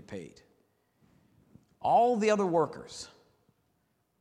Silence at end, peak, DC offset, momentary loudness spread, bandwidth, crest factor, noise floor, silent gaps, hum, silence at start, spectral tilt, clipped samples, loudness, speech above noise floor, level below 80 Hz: 1.15 s; -14 dBFS; under 0.1%; 20 LU; 11.5 kHz; 18 dB; -75 dBFS; none; none; 0.1 s; -5.5 dB/octave; under 0.1%; -27 LUFS; 47 dB; -70 dBFS